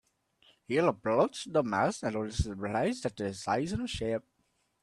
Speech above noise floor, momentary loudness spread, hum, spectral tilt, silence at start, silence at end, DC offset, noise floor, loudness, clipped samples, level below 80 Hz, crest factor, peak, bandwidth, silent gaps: 45 dB; 7 LU; none; -5.5 dB/octave; 0.7 s; 0.65 s; under 0.1%; -75 dBFS; -32 LUFS; under 0.1%; -50 dBFS; 20 dB; -12 dBFS; 12.5 kHz; none